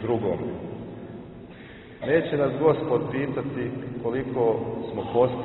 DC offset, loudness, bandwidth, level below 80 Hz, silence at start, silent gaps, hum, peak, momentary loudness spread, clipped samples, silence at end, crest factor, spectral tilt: under 0.1%; -26 LUFS; 4.1 kHz; -54 dBFS; 0 s; none; none; -6 dBFS; 19 LU; under 0.1%; 0 s; 20 dB; -11.5 dB/octave